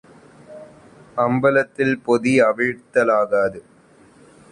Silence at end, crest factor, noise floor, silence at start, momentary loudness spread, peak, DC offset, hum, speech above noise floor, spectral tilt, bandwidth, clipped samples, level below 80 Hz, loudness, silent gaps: 0.9 s; 18 dB; -50 dBFS; 0.5 s; 6 LU; -4 dBFS; under 0.1%; none; 32 dB; -6.5 dB/octave; 10.5 kHz; under 0.1%; -60 dBFS; -19 LUFS; none